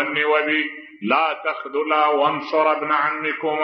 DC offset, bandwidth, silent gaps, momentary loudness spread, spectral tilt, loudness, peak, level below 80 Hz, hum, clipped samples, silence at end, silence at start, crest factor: under 0.1%; 6 kHz; none; 7 LU; -6 dB/octave; -20 LUFS; -4 dBFS; -80 dBFS; none; under 0.1%; 0 s; 0 s; 16 dB